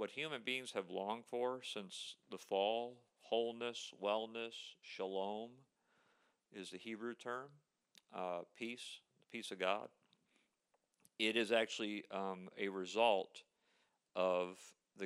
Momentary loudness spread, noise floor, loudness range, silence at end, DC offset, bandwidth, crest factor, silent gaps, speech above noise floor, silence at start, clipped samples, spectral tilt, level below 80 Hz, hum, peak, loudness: 16 LU; -84 dBFS; 9 LU; 0 s; under 0.1%; 13 kHz; 24 dB; none; 42 dB; 0 s; under 0.1%; -3.5 dB/octave; under -90 dBFS; none; -20 dBFS; -42 LUFS